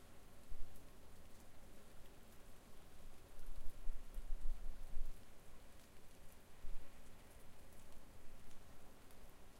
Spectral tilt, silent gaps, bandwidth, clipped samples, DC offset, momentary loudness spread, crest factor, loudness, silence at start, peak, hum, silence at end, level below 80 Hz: -4.5 dB/octave; none; 13.5 kHz; under 0.1%; under 0.1%; 9 LU; 16 dB; -60 LUFS; 0 s; -26 dBFS; none; 0 s; -50 dBFS